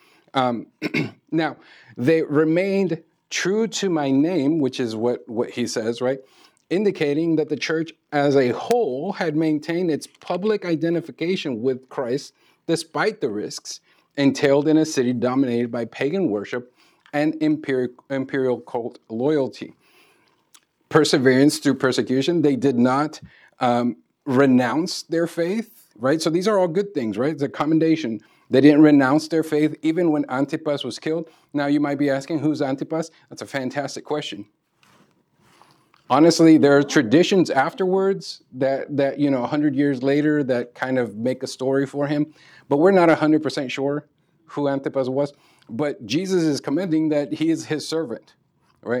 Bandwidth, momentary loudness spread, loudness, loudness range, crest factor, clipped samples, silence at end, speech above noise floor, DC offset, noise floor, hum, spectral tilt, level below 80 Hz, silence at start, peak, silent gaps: 13.5 kHz; 12 LU; -21 LUFS; 6 LU; 20 dB; under 0.1%; 0 s; 40 dB; under 0.1%; -60 dBFS; none; -5.5 dB/octave; -76 dBFS; 0.35 s; -2 dBFS; none